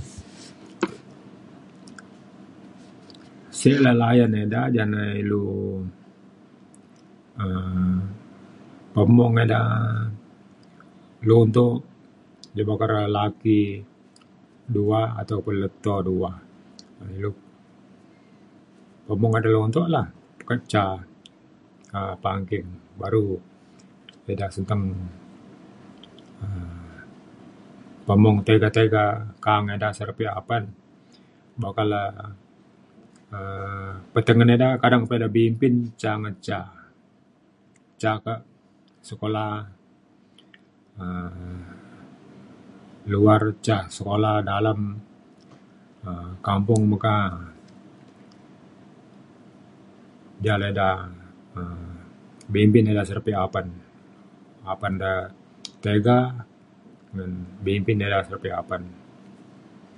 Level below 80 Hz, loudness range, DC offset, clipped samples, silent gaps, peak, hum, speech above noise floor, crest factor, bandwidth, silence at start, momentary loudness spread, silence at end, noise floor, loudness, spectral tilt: -48 dBFS; 11 LU; under 0.1%; under 0.1%; none; -2 dBFS; none; 37 dB; 22 dB; 11 kHz; 0 s; 22 LU; 0.65 s; -58 dBFS; -23 LUFS; -7.5 dB/octave